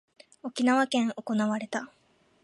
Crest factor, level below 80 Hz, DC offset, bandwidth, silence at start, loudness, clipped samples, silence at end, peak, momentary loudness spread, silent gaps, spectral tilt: 16 dB; -80 dBFS; under 0.1%; 11.5 kHz; 0.45 s; -28 LUFS; under 0.1%; 0.55 s; -14 dBFS; 15 LU; none; -4.5 dB/octave